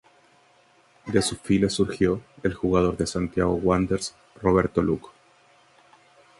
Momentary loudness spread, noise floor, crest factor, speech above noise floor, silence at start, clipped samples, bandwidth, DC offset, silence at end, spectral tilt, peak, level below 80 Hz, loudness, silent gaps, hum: 7 LU; -59 dBFS; 20 dB; 36 dB; 1.05 s; under 0.1%; 11.5 kHz; under 0.1%; 1.3 s; -5.5 dB/octave; -6 dBFS; -44 dBFS; -24 LUFS; none; none